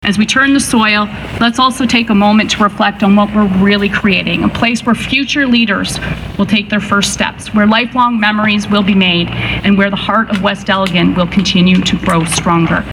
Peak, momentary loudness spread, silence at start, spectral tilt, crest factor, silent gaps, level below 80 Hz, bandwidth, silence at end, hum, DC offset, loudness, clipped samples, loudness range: 0 dBFS; 4 LU; 0 s; -4.5 dB/octave; 12 dB; none; -34 dBFS; 13.5 kHz; 0 s; none; under 0.1%; -11 LUFS; under 0.1%; 2 LU